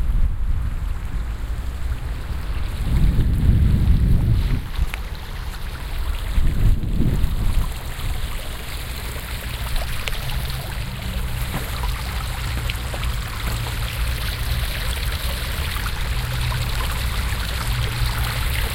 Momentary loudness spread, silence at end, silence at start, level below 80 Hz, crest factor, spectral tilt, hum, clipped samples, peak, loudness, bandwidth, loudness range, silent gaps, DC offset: 9 LU; 0 s; 0 s; -22 dBFS; 18 dB; -5 dB/octave; none; under 0.1%; -4 dBFS; -25 LUFS; 17 kHz; 6 LU; none; under 0.1%